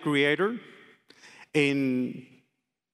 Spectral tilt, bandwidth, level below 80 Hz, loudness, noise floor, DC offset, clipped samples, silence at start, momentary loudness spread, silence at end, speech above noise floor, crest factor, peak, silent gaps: -5.5 dB/octave; 12.5 kHz; -78 dBFS; -27 LUFS; -79 dBFS; under 0.1%; under 0.1%; 0 s; 14 LU; 0.7 s; 53 dB; 20 dB; -10 dBFS; none